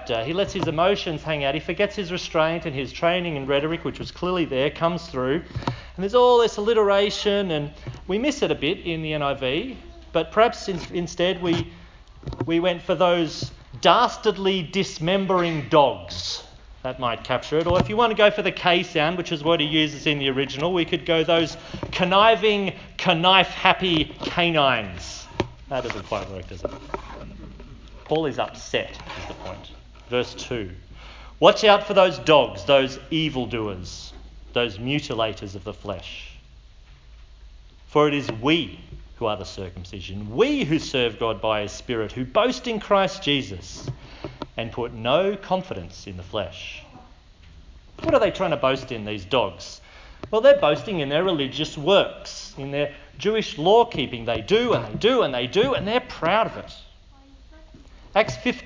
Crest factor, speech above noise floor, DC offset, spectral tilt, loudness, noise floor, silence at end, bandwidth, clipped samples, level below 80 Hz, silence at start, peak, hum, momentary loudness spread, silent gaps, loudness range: 22 dB; 27 dB; under 0.1%; -5 dB/octave; -22 LUFS; -49 dBFS; 0 s; 7.6 kHz; under 0.1%; -46 dBFS; 0 s; 0 dBFS; none; 17 LU; none; 9 LU